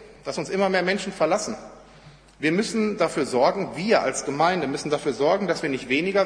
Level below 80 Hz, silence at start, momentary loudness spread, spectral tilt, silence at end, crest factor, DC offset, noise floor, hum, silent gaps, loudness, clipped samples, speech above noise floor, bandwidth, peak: -58 dBFS; 0 s; 6 LU; -4.5 dB/octave; 0 s; 18 dB; under 0.1%; -49 dBFS; none; none; -24 LUFS; under 0.1%; 26 dB; 10.5 kHz; -6 dBFS